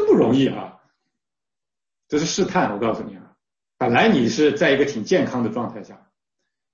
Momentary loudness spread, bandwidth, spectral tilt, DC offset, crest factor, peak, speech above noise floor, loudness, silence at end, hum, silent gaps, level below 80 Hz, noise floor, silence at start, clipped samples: 15 LU; 7.4 kHz; -5 dB/octave; under 0.1%; 16 dB; -4 dBFS; over 70 dB; -20 LUFS; 0.8 s; none; none; -58 dBFS; under -90 dBFS; 0 s; under 0.1%